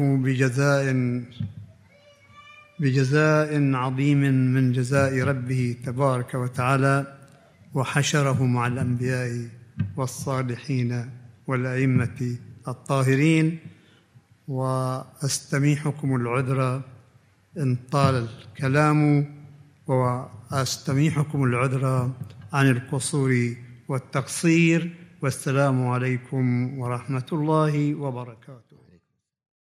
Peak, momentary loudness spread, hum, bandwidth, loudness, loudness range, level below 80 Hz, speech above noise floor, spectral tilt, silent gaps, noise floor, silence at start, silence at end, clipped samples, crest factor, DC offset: -4 dBFS; 12 LU; none; 14.5 kHz; -24 LUFS; 4 LU; -66 dBFS; 41 dB; -6.5 dB/octave; none; -64 dBFS; 0 s; 1.05 s; under 0.1%; 18 dB; under 0.1%